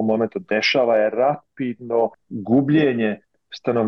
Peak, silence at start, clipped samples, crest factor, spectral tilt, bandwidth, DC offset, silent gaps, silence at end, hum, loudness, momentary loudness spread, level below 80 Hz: -8 dBFS; 0 s; under 0.1%; 12 dB; -6.5 dB/octave; 6.8 kHz; under 0.1%; none; 0 s; none; -20 LUFS; 12 LU; -62 dBFS